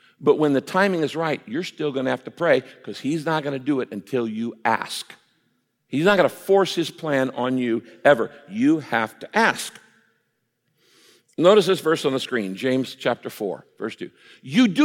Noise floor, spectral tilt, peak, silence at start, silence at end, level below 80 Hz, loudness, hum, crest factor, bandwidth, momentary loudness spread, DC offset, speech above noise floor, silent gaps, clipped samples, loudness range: -73 dBFS; -5 dB/octave; -2 dBFS; 0.2 s; 0 s; -70 dBFS; -22 LUFS; none; 20 dB; 16.5 kHz; 12 LU; under 0.1%; 51 dB; none; under 0.1%; 3 LU